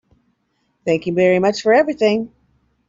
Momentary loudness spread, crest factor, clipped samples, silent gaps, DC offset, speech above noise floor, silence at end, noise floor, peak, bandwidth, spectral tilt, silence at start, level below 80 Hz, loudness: 10 LU; 16 dB; under 0.1%; none; under 0.1%; 51 dB; 0.6 s; -67 dBFS; -2 dBFS; 7.8 kHz; -6 dB/octave; 0.85 s; -58 dBFS; -17 LUFS